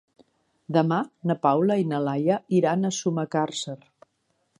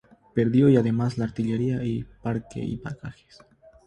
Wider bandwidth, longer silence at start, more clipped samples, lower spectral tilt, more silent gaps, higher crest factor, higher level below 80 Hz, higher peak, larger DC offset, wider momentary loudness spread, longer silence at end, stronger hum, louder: first, 11 kHz vs 9.6 kHz; first, 0.7 s vs 0.35 s; neither; second, -6 dB/octave vs -9 dB/octave; neither; about the same, 18 dB vs 18 dB; second, -74 dBFS vs -52 dBFS; about the same, -6 dBFS vs -6 dBFS; neither; second, 7 LU vs 15 LU; about the same, 0.85 s vs 0.75 s; neither; about the same, -24 LUFS vs -25 LUFS